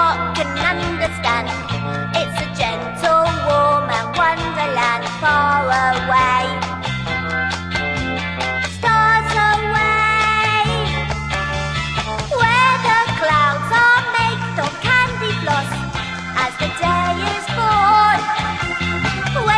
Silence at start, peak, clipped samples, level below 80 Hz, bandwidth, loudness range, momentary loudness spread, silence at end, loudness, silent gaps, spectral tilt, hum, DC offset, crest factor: 0 s; -2 dBFS; under 0.1%; -36 dBFS; 11 kHz; 3 LU; 8 LU; 0 s; -17 LUFS; none; -4.5 dB/octave; none; under 0.1%; 16 dB